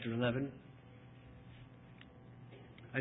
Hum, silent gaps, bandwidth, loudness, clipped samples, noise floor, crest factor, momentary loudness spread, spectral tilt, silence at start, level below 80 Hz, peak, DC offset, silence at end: none; none; 3.9 kHz; -39 LUFS; under 0.1%; -57 dBFS; 22 dB; 21 LU; -5 dB/octave; 0 s; -66 dBFS; -22 dBFS; under 0.1%; 0 s